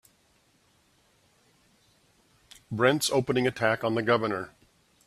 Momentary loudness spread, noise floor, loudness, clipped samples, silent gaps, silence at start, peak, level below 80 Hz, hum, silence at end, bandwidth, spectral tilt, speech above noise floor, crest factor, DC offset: 12 LU; -66 dBFS; -26 LUFS; under 0.1%; none; 2.7 s; -6 dBFS; -66 dBFS; none; 0.6 s; 14.5 kHz; -4.5 dB/octave; 40 dB; 24 dB; under 0.1%